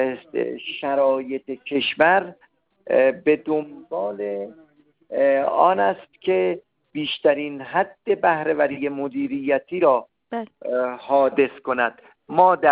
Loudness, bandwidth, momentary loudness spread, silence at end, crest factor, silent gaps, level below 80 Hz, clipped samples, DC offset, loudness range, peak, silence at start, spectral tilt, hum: -22 LUFS; 5 kHz; 12 LU; 0 s; 18 dB; none; -68 dBFS; under 0.1%; under 0.1%; 1 LU; -4 dBFS; 0 s; -8.5 dB/octave; none